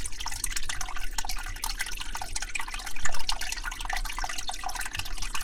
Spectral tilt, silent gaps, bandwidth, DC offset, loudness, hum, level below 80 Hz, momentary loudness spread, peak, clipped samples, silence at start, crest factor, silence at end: -0.5 dB/octave; none; 16.5 kHz; under 0.1%; -33 LUFS; none; -36 dBFS; 3 LU; -8 dBFS; under 0.1%; 0 s; 18 dB; 0 s